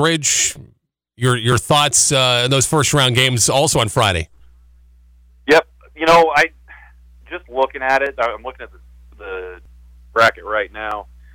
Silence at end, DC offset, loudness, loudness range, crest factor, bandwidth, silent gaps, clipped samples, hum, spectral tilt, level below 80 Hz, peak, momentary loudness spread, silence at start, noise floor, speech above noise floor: 0.3 s; under 0.1%; -15 LUFS; 8 LU; 14 dB; over 20 kHz; none; under 0.1%; 60 Hz at -55 dBFS; -3 dB/octave; -42 dBFS; -4 dBFS; 18 LU; 0 s; -57 dBFS; 41 dB